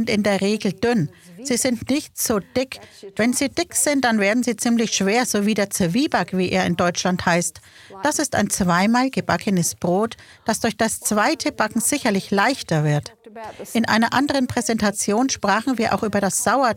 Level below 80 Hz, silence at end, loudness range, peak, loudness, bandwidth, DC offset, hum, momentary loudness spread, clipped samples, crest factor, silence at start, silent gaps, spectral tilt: -52 dBFS; 0 s; 2 LU; -2 dBFS; -20 LUFS; 17 kHz; under 0.1%; none; 7 LU; under 0.1%; 18 dB; 0 s; none; -4 dB/octave